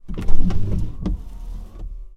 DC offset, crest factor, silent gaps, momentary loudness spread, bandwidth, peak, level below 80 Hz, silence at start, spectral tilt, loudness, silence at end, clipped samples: under 0.1%; 16 dB; none; 13 LU; 3.1 kHz; 0 dBFS; -24 dBFS; 0.05 s; -8.5 dB/octave; -28 LUFS; 0.1 s; under 0.1%